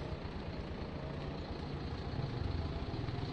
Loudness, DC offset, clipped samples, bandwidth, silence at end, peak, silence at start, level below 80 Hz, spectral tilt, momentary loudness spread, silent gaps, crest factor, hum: -42 LUFS; under 0.1%; under 0.1%; 8.6 kHz; 0 s; -26 dBFS; 0 s; -48 dBFS; -7.5 dB/octave; 4 LU; none; 14 dB; none